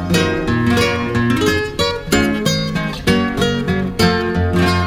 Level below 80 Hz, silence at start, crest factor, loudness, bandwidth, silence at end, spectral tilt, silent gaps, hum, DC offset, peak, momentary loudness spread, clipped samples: -32 dBFS; 0 s; 14 dB; -16 LUFS; 17 kHz; 0 s; -5 dB/octave; none; none; under 0.1%; -2 dBFS; 4 LU; under 0.1%